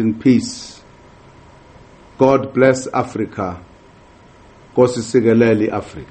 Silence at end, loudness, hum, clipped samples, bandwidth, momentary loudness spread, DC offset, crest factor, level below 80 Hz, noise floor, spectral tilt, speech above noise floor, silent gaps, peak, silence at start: 0.05 s; -16 LUFS; none; under 0.1%; 8.8 kHz; 13 LU; under 0.1%; 18 dB; -50 dBFS; -45 dBFS; -6.5 dB/octave; 30 dB; none; 0 dBFS; 0 s